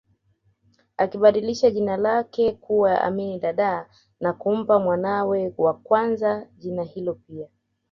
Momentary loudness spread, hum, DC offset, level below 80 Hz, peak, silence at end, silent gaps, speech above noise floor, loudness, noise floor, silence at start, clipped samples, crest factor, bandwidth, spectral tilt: 12 LU; none; under 0.1%; -60 dBFS; -4 dBFS; 0.45 s; none; 44 dB; -22 LUFS; -66 dBFS; 1 s; under 0.1%; 20 dB; 7.2 kHz; -6.5 dB/octave